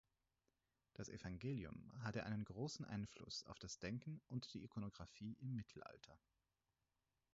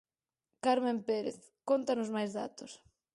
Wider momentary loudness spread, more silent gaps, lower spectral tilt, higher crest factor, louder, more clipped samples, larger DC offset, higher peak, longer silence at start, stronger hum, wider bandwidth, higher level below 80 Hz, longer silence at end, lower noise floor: second, 10 LU vs 17 LU; neither; about the same, -5.5 dB/octave vs -5 dB/octave; about the same, 18 dB vs 18 dB; second, -51 LUFS vs -34 LUFS; neither; neither; second, -34 dBFS vs -16 dBFS; first, 1 s vs 0.65 s; neither; second, 7.6 kHz vs 11.5 kHz; first, -72 dBFS vs -78 dBFS; first, 1.15 s vs 0.4 s; about the same, under -90 dBFS vs -88 dBFS